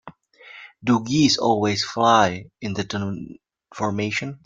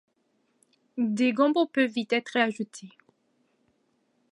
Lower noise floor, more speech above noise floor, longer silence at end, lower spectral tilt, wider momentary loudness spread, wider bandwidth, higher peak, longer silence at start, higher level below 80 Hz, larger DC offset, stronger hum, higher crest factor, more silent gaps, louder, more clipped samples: second, -46 dBFS vs -72 dBFS; second, 25 dB vs 46 dB; second, 0.1 s vs 1.45 s; about the same, -4.5 dB/octave vs -5 dB/octave; about the same, 16 LU vs 14 LU; second, 9.2 kHz vs 11.5 kHz; first, -4 dBFS vs -8 dBFS; second, 0.05 s vs 0.95 s; first, -58 dBFS vs -84 dBFS; neither; neither; about the same, 20 dB vs 20 dB; neither; first, -21 LUFS vs -26 LUFS; neither